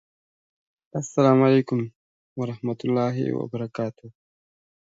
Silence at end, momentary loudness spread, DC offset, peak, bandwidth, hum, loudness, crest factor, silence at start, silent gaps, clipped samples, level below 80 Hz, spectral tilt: 0.8 s; 15 LU; under 0.1%; -4 dBFS; 7.8 kHz; none; -24 LUFS; 20 dB; 0.95 s; 1.96-2.36 s; under 0.1%; -68 dBFS; -7.5 dB/octave